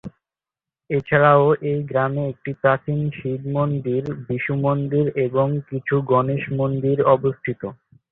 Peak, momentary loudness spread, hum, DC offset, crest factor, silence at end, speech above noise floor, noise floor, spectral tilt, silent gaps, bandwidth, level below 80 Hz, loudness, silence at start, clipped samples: -2 dBFS; 11 LU; none; under 0.1%; 18 dB; 0.35 s; 70 dB; -90 dBFS; -10.5 dB/octave; none; 4 kHz; -54 dBFS; -21 LUFS; 0.05 s; under 0.1%